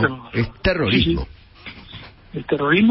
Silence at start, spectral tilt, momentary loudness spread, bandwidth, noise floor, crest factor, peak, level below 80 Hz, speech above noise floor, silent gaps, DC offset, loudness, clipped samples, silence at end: 0 s; -10.5 dB/octave; 21 LU; 5.8 kHz; -40 dBFS; 16 dB; -4 dBFS; -36 dBFS; 22 dB; none; under 0.1%; -20 LUFS; under 0.1%; 0 s